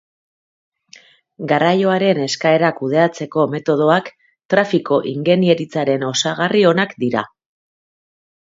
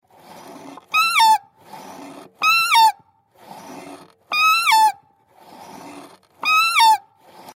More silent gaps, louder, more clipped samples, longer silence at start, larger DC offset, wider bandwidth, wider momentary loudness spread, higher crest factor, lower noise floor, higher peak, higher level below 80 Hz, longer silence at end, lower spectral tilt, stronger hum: first, 4.45-4.49 s vs none; about the same, -16 LUFS vs -16 LUFS; neither; first, 1.4 s vs 0.5 s; neither; second, 7.8 kHz vs 16 kHz; second, 5 LU vs 25 LU; about the same, 18 dB vs 16 dB; second, -47 dBFS vs -53 dBFS; first, 0 dBFS vs -4 dBFS; first, -64 dBFS vs -80 dBFS; first, 1.2 s vs 0.55 s; first, -5 dB/octave vs 1 dB/octave; neither